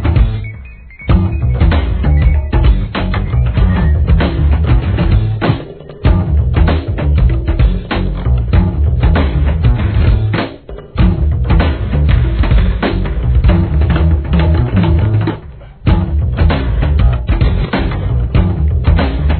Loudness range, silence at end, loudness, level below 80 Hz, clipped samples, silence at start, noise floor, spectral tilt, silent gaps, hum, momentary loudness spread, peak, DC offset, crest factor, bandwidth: 1 LU; 0 s; -13 LUFS; -14 dBFS; under 0.1%; 0 s; -31 dBFS; -11.5 dB/octave; none; none; 5 LU; 0 dBFS; 0.3%; 12 dB; 4.5 kHz